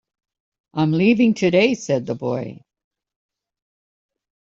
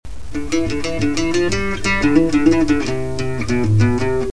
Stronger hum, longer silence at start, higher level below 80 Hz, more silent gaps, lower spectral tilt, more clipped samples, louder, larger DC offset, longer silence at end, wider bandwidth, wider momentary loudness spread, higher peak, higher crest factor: neither; first, 0.75 s vs 0 s; second, -62 dBFS vs -32 dBFS; neither; about the same, -6.5 dB/octave vs -6 dB/octave; neither; about the same, -19 LUFS vs -18 LUFS; second, under 0.1% vs 6%; first, 1.85 s vs 0 s; second, 7.6 kHz vs 11 kHz; first, 12 LU vs 8 LU; second, -4 dBFS vs 0 dBFS; about the same, 18 dB vs 16 dB